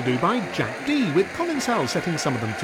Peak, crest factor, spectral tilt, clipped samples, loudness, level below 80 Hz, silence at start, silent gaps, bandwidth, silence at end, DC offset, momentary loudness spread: -8 dBFS; 14 dB; -5 dB/octave; under 0.1%; -23 LUFS; -58 dBFS; 0 s; none; 17 kHz; 0 s; under 0.1%; 4 LU